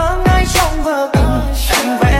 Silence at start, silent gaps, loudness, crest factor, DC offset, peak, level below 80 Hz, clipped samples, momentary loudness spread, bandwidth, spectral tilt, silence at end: 0 s; none; -14 LUFS; 12 dB; under 0.1%; 0 dBFS; -18 dBFS; under 0.1%; 4 LU; 16.5 kHz; -4.5 dB/octave; 0 s